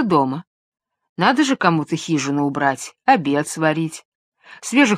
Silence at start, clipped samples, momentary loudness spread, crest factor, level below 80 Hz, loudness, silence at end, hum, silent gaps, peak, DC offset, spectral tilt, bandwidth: 0 s; under 0.1%; 12 LU; 18 dB; -66 dBFS; -19 LUFS; 0 s; none; 0.47-0.72 s, 1.09-1.16 s, 4.05-4.32 s; 0 dBFS; under 0.1%; -5 dB/octave; 14 kHz